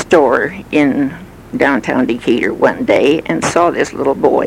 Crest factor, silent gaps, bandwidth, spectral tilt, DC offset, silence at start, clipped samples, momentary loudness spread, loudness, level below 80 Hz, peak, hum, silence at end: 14 dB; none; 15.5 kHz; -5 dB/octave; under 0.1%; 0 s; under 0.1%; 5 LU; -14 LUFS; -44 dBFS; 0 dBFS; none; 0 s